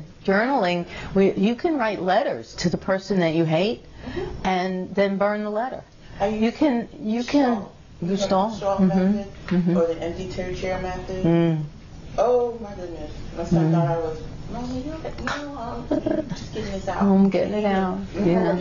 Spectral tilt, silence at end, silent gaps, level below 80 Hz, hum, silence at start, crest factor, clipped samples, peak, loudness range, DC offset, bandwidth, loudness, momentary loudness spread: -7 dB/octave; 0 s; none; -42 dBFS; none; 0 s; 16 dB; under 0.1%; -8 dBFS; 3 LU; under 0.1%; 7.4 kHz; -23 LUFS; 12 LU